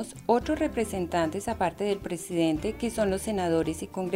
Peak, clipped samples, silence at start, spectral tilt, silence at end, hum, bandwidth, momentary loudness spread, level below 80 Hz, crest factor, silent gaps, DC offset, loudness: -10 dBFS; under 0.1%; 0 s; -5.5 dB/octave; 0 s; none; 16 kHz; 5 LU; -48 dBFS; 18 dB; none; under 0.1%; -28 LUFS